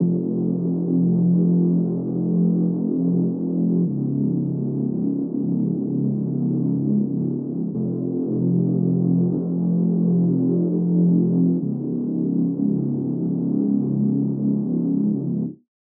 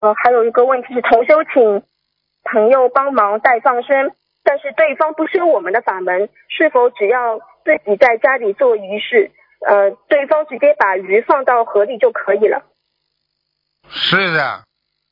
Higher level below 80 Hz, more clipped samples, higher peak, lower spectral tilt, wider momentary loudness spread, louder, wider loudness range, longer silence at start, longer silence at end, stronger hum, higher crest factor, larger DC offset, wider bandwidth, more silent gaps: about the same, -66 dBFS vs -64 dBFS; neither; second, -8 dBFS vs 0 dBFS; first, -16.5 dB/octave vs -6.5 dB/octave; about the same, 6 LU vs 7 LU; second, -21 LUFS vs -14 LUFS; about the same, 3 LU vs 3 LU; about the same, 0 s vs 0 s; about the same, 0.45 s vs 0.55 s; neither; about the same, 12 dB vs 14 dB; neither; second, 1.3 kHz vs 6 kHz; neither